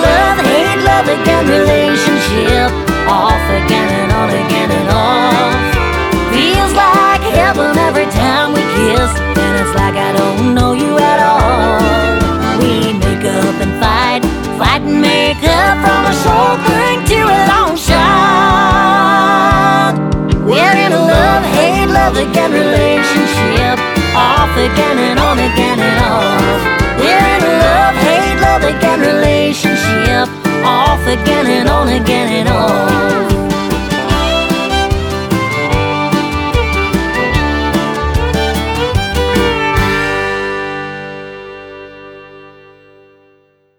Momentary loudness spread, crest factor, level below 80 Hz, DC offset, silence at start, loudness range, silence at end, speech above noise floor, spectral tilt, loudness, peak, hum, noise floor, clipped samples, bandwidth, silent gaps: 5 LU; 10 dB; -22 dBFS; under 0.1%; 0 s; 4 LU; 1.3 s; 41 dB; -5 dB/octave; -11 LUFS; 0 dBFS; none; -52 dBFS; under 0.1%; over 20 kHz; none